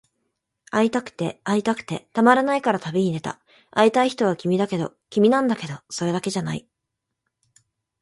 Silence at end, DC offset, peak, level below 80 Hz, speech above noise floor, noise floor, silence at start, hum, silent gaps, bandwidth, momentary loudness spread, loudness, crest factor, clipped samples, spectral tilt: 1.4 s; under 0.1%; -2 dBFS; -64 dBFS; 60 dB; -81 dBFS; 0.75 s; none; none; 11.5 kHz; 12 LU; -22 LUFS; 22 dB; under 0.1%; -5.5 dB/octave